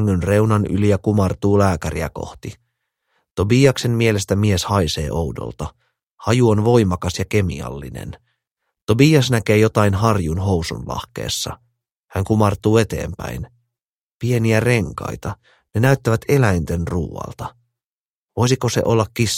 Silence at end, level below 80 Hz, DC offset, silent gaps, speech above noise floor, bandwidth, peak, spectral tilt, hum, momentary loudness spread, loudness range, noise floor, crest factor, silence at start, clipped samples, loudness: 0 s; -38 dBFS; under 0.1%; 3.31-3.35 s, 6.03-6.18 s, 8.82-8.87 s, 11.92-12.08 s, 13.89-14.19 s, 17.86-18.27 s; over 72 dB; 16.5 kHz; 0 dBFS; -6 dB/octave; none; 16 LU; 3 LU; under -90 dBFS; 18 dB; 0 s; under 0.1%; -18 LUFS